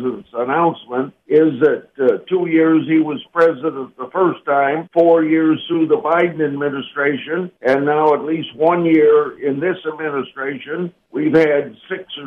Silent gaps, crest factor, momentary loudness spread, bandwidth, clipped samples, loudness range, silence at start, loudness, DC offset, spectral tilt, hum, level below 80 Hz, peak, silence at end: none; 14 dB; 11 LU; 5.4 kHz; under 0.1%; 1 LU; 0 s; -17 LUFS; under 0.1%; -8 dB/octave; none; -64 dBFS; -2 dBFS; 0 s